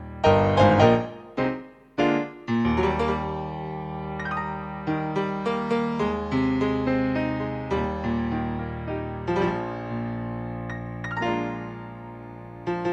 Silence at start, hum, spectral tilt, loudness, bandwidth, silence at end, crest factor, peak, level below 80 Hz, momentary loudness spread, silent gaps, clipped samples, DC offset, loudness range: 0 s; none; -7.5 dB/octave; -26 LUFS; 8.4 kHz; 0 s; 22 dB; -4 dBFS; -44 dBFS; 13 LU; none; under 0.1%; under 0.1%; 6 LU